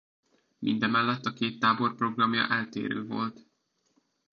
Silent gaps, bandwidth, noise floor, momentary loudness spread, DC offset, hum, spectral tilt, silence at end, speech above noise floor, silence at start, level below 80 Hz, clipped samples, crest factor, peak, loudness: none; 7 kHz; -74 dBFS; 8 LU; under 0.1%; none; -6 dB/octave; 1 s; 46 dB; 0.6 s; -74 dBFS; under 0.1%; 20 dB; -10 dBFS; -28 LUFS